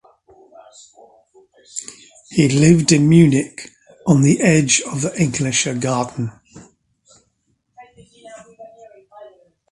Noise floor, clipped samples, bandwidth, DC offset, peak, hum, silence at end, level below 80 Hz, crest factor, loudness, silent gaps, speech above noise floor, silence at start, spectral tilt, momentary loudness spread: -67 dBFS; under 0.1%; 11.5 kHz; under 0.1%; 0 dBFS; none; 0.45 s; -50 dBFS; 18 dB; -15 LUFS; none; 52 dB; 1.75 s; -5 dB/octave; 19 LU